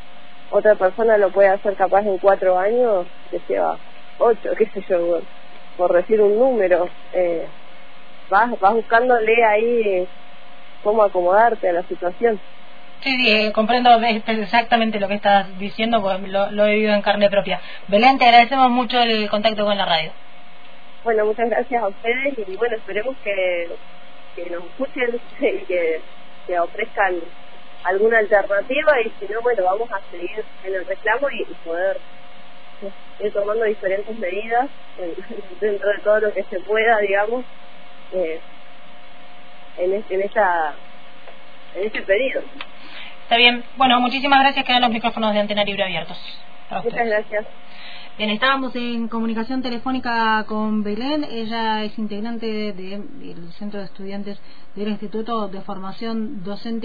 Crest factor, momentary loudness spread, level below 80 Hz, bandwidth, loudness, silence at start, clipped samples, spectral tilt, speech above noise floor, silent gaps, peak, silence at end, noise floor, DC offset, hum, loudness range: 18 dB; 16 LU; -54 dBFS; 5 kHz; -19 LUFS; 0.5 s; under 0.1%; -6.5 dB/octave; 26 dB; none; -2 dBFS; 0 s; -46 dBFS; 4%; none; 8 LU